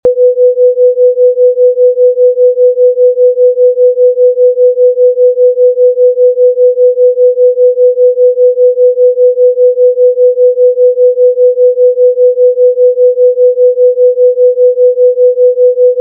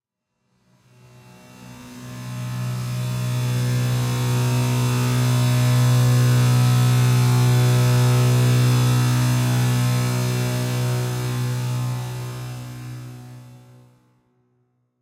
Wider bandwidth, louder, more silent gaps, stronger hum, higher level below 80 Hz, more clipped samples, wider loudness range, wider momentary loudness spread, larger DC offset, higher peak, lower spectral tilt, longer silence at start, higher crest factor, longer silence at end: second, 0.8 kHz vs 16.5 kHz; first, -7 LUFS vs -20 LUFS; neither; neither; second, -60 dBFS vs -48 dBFS; neither; second, 0 LU vs 12 LU; second, 0 LU vs 16 LU; neither; first, 0 dBFS vs -8 dBFS; about the same, -5.5 dB/octave vs -5.5 dB/octave; second, 0.05 s vs 1.6 s; second, 6 dB vs 12 dB; second, 0 s vs 1.45 s